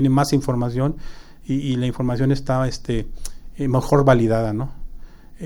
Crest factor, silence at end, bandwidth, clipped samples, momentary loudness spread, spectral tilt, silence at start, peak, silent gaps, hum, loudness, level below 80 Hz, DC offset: 20 dB; 0 s; 17 kHz; under 0.1%; 18 LU; -7 dB/octave; 0 s; 0 dBFS; none; none; -21 LUFS; -34 dBFS; under 0.1%